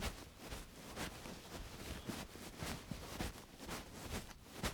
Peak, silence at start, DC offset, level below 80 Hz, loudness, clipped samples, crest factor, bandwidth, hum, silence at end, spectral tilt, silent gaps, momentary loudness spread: -26 dBFS; 0 s; under 0.1%; -56 dBFS; -49 LUFS; under 0.1%; 22 dB; over 20 kHz; none; 0 s; -4 dB/octave; none; 5 LU